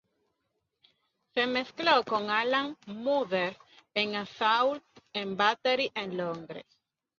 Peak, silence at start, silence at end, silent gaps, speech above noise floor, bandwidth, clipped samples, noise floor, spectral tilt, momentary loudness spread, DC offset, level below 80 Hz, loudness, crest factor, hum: -10 dBFS; 1.35 s; 0.6 s; none; 51 dB; 7.2 kHz; under 0.1%; -81 dBFS; -4.5 dB/octave; 12 LU; under 0.1%; -76 dBFS; -29 LUFS; 22 dB; none